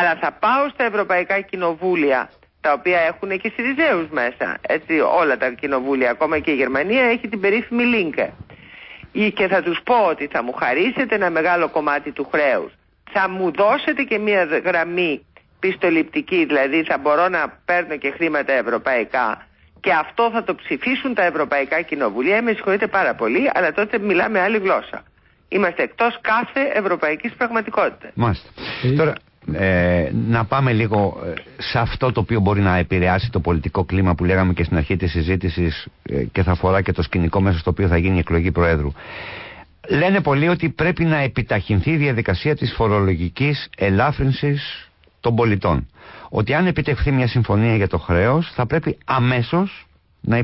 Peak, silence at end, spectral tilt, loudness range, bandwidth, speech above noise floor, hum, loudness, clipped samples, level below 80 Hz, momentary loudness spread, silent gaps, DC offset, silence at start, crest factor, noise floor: -6 dBFS; 0 s; -11.5 dB/octave; 2 LU; 5.8 kHz; 22 dB; none; -19 LUFS; under 0.1%; -34 dBFS; 7 LU; none; under 0.1%; 0 s; 12 dB; -41 dBFS